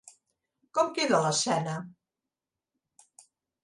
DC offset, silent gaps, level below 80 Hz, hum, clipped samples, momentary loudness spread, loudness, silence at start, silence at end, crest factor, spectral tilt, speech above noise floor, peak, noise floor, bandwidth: under 0.1%; none; -76 dBFS; none; under 0.1%; 13 LU; -28 LUFS; 0.75 s; 1.7 s; 22 dB; -3.5 dB/octave; 62 dB; -10 dBFS; -89 dBFS; 11.5 kHz